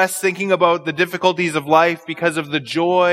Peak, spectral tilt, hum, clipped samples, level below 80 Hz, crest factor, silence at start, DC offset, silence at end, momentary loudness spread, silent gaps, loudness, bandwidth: 0 dBFS; -4.5 dB/octave; none; under 0.1%; -68 dBFS; 18 dB; 0 s; under 0.1%; 0 s; 6 LU; none; -18 LUFS; 16 kHz